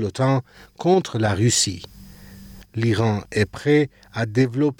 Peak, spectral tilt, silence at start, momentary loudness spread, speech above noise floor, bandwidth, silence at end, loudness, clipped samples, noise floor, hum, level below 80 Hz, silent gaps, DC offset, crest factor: -6 dBFS; -5 dB/octave; 0 s; 9 LU; 22 dB; 19 kHz; 0.05 s; -21 LUFS; under 0.1%; -42 dBFS; none; -52 dBFS; none; under 0.1%; 16 dB